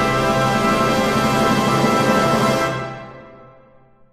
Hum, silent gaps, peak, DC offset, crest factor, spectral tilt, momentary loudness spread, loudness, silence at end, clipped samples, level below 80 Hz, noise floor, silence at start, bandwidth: none; none; -4 dBFS; under 0.1%; 16 dB; -5 dB/octave; 11 LU; -17 LUFS; 0.7 s; under 0.1%; -40 dBFS; -50 dBFS; 0 s; 15.5 kHz